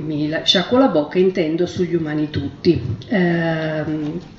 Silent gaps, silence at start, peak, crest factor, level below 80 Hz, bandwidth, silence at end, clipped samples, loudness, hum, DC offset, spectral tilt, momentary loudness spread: none; 0 s; -2 dBFS; 16 dB; -50 dBFS; 7.8 kHz; 0 s; under 0.1%; -19 LUFS; none; under 0.1%; -6 dB/octave; 7 LU